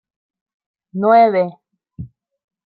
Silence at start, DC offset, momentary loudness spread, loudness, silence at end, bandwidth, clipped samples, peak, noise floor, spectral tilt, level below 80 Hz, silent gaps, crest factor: 0.95 s; under 0.1%; 24 LU; -14 LUFS; 0.6 s; 4.9 kHz; under 0.1%; -2 dBFS; -36 dBFS; -11.5 dB/octave; -56 dBFS; none; 18 dB